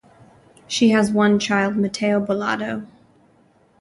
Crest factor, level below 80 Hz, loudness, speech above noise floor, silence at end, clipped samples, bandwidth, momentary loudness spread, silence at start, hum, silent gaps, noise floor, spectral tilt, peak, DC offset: 16 dB; -60 dBFS; -19 LUFS; 38 dB; 0.95 s; under 0.1%; 11.5 kHz; 10 LU; 0.7 s; none; none; -57 dBFS; -5 dB/octave; -6 dBFS; under 0.1%